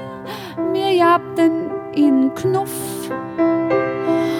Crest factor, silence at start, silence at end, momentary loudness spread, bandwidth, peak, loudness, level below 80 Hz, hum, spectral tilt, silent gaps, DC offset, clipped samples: 14 dB; 0 s; 0 s; 11 LU; 18 kHz; -4 dBFS; -18 LUFS; -58 dBFS; none; -5.5 dB/octave; none; under 0.1%; under 0.1%